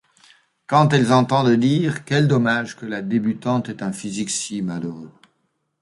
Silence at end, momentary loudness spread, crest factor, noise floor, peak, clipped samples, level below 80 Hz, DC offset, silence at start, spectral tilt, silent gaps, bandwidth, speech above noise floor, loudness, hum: 0.7 s; 12 LU; 18 dB; -70 dBFS; -2 dBFS; under 0.1%; -60 dBFS; under 0.1%; 0.7 s; -5.5 dB/octave; none; 11.5 kHz; 51 dB; -20 LUFS; none